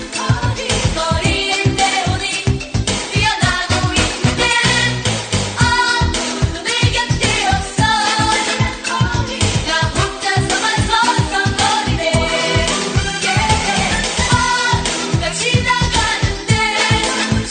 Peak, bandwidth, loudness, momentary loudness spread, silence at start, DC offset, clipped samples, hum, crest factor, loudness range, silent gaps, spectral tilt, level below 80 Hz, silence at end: 0 dBFS; 9.6 kHz; -15 LUFS; 4 LU; 0 s; under 0.1%; under 0.1%; none; 16 dB; 1 LU; none; -3.5 dB/octave; -28 dBFS; 0 s